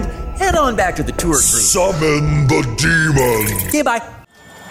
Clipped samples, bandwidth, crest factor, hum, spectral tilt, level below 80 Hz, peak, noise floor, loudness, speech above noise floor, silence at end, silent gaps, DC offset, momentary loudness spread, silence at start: under 0.1%; 16.5 kHz; 12 dB; none; -4 dB/octave; -28 dBFS; -4 dBFS; -40 dBFS; -14 LUFS; 25 dB; 0 s; none; under 0.1%; 7 LU; 0 s